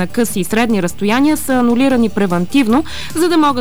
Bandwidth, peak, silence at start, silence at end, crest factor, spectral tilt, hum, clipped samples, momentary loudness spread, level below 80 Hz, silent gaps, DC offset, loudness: over 20 kHz; -4 dBFS; 0 s; 0 s; 10 dB; -5 dB/octave; none; under 0.1%; 4 LU; -40 dBFS; none; 5%; -14 LUFS